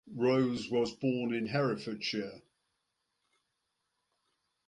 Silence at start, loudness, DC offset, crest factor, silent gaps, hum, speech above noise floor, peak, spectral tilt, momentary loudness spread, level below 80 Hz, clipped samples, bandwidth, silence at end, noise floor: 0.05 s; -33 LUFS; under 0.1%; 18 dB; none; none; 51 dB; -18 dBFS; -6 dB/octave; 7 LU; -72 dBFS; under 0.1%; 10.5 kHz; 2.25 s; -83 dBFS